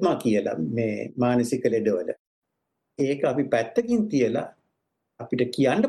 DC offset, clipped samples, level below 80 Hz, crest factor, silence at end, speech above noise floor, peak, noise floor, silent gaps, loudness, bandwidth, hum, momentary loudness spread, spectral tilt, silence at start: under 0.1%; under 0.1%; -64 dBFS; 16 dB; 0 s; 56 dB; -8 dBFS; -80 dBFS; 2.19-2.42 s; -25 LUFS; 12.5 kHz; none; 9 LU; -6.5 dB/octave; 0 s